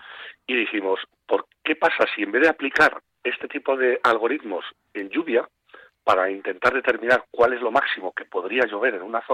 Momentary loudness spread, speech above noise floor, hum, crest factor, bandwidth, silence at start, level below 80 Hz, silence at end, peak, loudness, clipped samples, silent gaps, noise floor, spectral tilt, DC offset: 10 LU; 29 dB; none; 18 dB; 12.5 kHz; 0 s; -62 dBFS; 0 s; -6 dBFS; -22 LUFS; under 0.1%; none; -51 dBFS; -4 dB/octave; under 0.1%